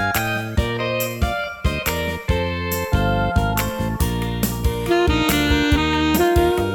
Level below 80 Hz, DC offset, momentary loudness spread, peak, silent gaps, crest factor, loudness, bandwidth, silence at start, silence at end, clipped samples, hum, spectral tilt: -28 dBFS; under 0.1%; 6 LU; -4 dBFS; none; 16 dB; -20 LUFS; over 20 kHz; 0 s; 0 s; under 0.1%; none; -5 dB/octave